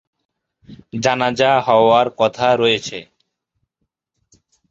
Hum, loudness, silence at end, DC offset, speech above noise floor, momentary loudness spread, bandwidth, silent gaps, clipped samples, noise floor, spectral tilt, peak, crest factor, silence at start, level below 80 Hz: none; -15 LUFS; 1.65 s; under 0.1%; 59 dB; 14 LU; 7.8 kHz; none; under 0.1%; -75 dBFS; -4.5 dB/octave; 0 dBFS; 18 dB; 0.7 s; -56 dBFS